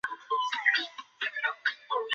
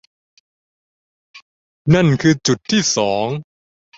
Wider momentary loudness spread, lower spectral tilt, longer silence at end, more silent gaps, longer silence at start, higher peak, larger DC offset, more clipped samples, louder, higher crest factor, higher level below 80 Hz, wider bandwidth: about the same, 9 LU vs 11 LU; second, 5 dB/octave vs -5 dB/octave; second, 0 s vs 0.55 s; second, none vs 1.42-1.85 s; second, 0.05 s vs 1.35 s; second, -10 dBFS vs -2 dBFS; neither; neither; second, -30 LUFS vs -16 LUFS; about the same, 20 dB vs 18 dB; second, -84 dBFS vs -50 dBFS; about the same, 8 kHz vs 8 kHz